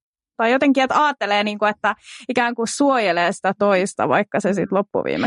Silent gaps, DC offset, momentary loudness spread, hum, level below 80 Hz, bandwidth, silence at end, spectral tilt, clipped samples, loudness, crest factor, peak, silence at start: none; under 0.1%; 6 LU; none; -64 dBFS; 11.5 kHz; 0 s; -4.5 dB/octave; under 0.1%; -19 LUFS; 14 dB; -4 dBFS; 0.4 s